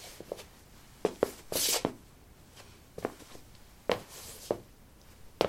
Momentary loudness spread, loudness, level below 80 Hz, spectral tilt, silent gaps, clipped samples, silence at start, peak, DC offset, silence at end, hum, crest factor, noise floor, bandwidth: 26 LU; -35 LUFS; -60 dBFS; -2.5 dB/octave; none; under 0.1%; 0 s; -6 dBFS; under 0.1%; 0 s; none; 30 dB; -56 dBFS; 16.5 kHz